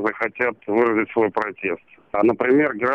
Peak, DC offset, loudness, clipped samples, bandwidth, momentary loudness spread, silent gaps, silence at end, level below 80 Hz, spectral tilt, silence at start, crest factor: -6 dBFS; under 0.1%; -21 LUFS; under 0.1%; 6 kHz; 9 LU; none; 0 s; -62 dBFS; -8 dB/octave; 0 s; 14 dB